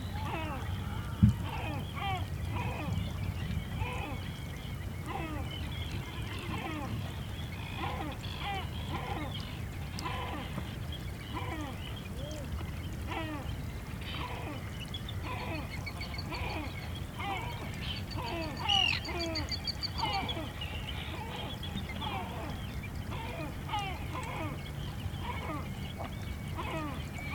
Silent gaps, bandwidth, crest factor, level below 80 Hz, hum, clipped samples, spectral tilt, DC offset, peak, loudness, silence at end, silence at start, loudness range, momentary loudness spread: none; 19.5 kHz; 26 dB; -44 dBFS; none; under 0.1%; -5 dB/octave; under 0.1%; -10 dBFS; -37 LUFS; 0 s; 0 s; 6 LU; 6 LU